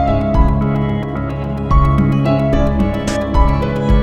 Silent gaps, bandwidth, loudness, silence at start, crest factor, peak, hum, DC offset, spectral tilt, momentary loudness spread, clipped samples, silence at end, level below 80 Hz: none; 9.4 kHz; -16 LUFS; 0 s; 14 dB; 0 dBFS; none; under 0.1%; -8 dB/octave; 7 LU; under 0.1%; 0 s; -18 dBFS